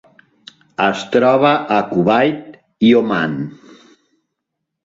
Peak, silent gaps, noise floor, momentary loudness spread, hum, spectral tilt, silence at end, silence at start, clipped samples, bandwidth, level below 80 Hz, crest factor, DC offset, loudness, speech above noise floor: 0 dBFS; none; -77 dBFS; 14 LU; none; -6.5 dB/octave; 1.3 s; 0.8 s; under 0.1%; 7.8 kHz; -58 dBFS; 16 dB; under 0.1%; -15 LUFS; 63 dB